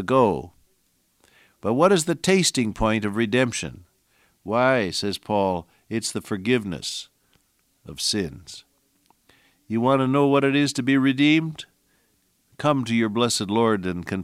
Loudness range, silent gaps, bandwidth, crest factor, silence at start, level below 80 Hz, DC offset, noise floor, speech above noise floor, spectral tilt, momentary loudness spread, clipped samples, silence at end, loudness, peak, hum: 6 LU; none; 15.5 kHz; 18 dB; 0 s; -50 dBFS; under 0.1%; -67 dBFS; 45 dB; -4.5 dB/octave; 13 LU; under 0.1%; 0 s; -22 LUFS; -4 dBFS; none